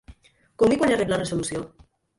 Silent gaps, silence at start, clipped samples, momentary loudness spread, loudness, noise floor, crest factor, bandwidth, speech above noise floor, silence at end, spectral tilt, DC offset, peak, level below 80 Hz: none; 0.1 s; under 0.1%; 13 LU; -23 LUFS; -51 dBFS; 16 dB; 11.5 kHz; 29 dB; 0.5 s; -5 dB/octave; under 0.1%; -8 dBFS; -50 dBFS